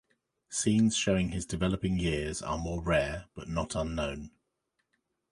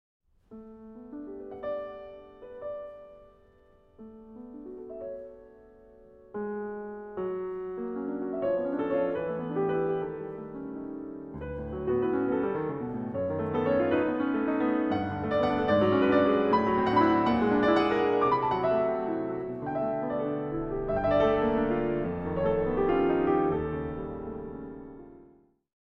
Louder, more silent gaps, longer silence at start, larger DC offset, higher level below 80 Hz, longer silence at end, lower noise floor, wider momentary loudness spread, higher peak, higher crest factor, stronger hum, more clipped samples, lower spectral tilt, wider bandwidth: second, -31 LUFS vs -28 LUFS; neither; about the same, 0.5 s vs 0.5 s; neither; first, -46 dBFS vs -52 dBFS; first, 1.05 s vs 0.7 s; first, -81 dBFS vs -60 dBFS; second, 11 LU vs 19 LU; about the same, -14 dBFS vs -12 dBFS; about the same, 18 dB vs 18 dB; neither; neither; second, -5 dB/octave vs -8.5 dB/octave; first, 11.5 kHz vs 6.6 kHz